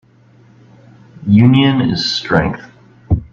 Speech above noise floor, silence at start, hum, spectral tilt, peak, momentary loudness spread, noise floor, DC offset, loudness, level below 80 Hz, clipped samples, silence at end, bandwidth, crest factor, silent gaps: 35 dB; 1.2 s; none; -6.5 dB/octave; 0 dBFS; 13 LU; -47 dBFS; under 0.1%; -13 LUFS; -36 dBFS; under 0.1%; 0.1 s; 7.6 kHz; 14 dB; none